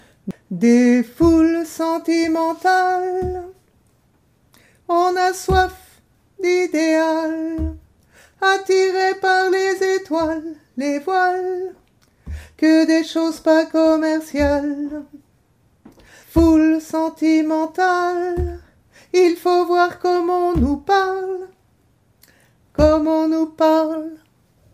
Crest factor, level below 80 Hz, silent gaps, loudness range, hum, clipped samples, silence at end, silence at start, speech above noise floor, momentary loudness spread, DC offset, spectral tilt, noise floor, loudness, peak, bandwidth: 16 dB; -36 dBFS; none; 3 LU; none; under 0.1%; 0.55 s; 0.25 s; 42 dB; 13 LU; under 0.1%; -5.5 dB/octave; -59 dBFS; -18 LUFS; -2 dBFS; 15 kHz